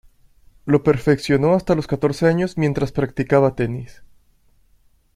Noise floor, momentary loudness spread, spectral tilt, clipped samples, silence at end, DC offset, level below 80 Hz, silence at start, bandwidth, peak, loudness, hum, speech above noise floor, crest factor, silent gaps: -57 dBFS; 7 LU; -7.5 dB/octave; under 0.1%; 1.1 s; under 0.1%; -44 dBFS; 0.65 s; 13.5 kHz; -2 dBFS; -19 LUFS; none; 39 dB; 18 dB; none